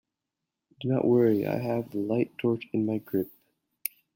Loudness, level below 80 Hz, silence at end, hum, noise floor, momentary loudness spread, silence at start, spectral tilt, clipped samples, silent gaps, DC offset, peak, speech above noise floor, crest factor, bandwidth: -28 LUFS; -70 dBFS; 0.85 s; none; -86 dBFS; 14 LU; 0.8 s; -7.5 dB/octave; under 0.1%; none; under 0.1%; -8 dBFS; 60 dB; 22 dB; 16.5 kHz